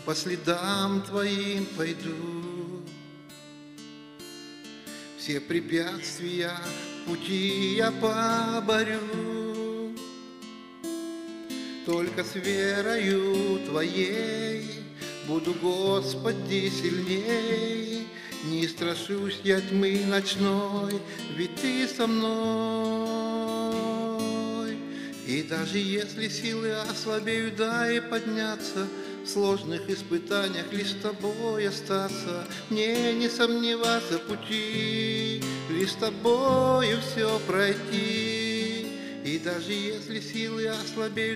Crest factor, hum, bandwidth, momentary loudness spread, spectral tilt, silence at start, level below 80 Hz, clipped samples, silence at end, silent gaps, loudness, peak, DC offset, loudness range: 20 dB; none; 15.5 kHz; 12 LU; -4.5 dB/octave; 0 s; -72 dBFS; under 0.1%; 0 s; none; -28 LUFS; -8 dBFS; under 0.1%; 7 LU